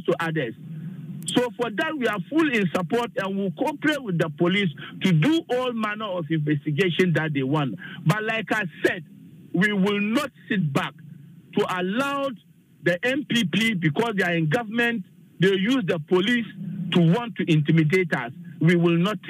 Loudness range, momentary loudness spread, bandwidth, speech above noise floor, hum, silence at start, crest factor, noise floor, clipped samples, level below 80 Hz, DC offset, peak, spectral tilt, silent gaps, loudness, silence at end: 3 LU; 9 LU; 15.5 kHz; 22 dB; none; 0 s; 18 dB; -45 dBFS; under 0.1%; -70 dBFS; under 0.1%; -6 dBFS; -6 dB/octave; none; -24 LUFS; 0 s